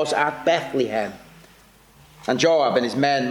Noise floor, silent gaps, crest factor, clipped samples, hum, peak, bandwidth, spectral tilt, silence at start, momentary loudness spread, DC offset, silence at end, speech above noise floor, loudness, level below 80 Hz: -52 dBFS; none; 16 dB; under 0.1%; none; -6 dBFS; 18.5 kHz; -4.5 dB/octave; 0 s; 9 LU; under 0.1%; 0 s; 31 dB; -21 LUFS; -60 dBFS